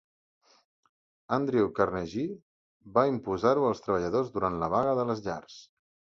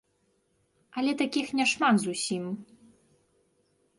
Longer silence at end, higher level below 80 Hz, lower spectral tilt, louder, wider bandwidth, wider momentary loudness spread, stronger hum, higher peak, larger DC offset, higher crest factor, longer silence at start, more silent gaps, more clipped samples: second, 0.5 s vs 1.35 s; first, -58 dBFS vs -74 dBFS; first, -7 dB/octave vs -3.5 dB/octave; about the same, -29 LUFS vs -27 LUFS; second, 7.4 kHz vs 11.5 kHz; second, 10 LU vs 14 LU; neither; first, -8 dBFS vs -12 dBFS; neither; about the same, 22 dB vs 18 dB; first, 1.3 s vs 0.95 s; first, 2.42-2.80 s vs none; neither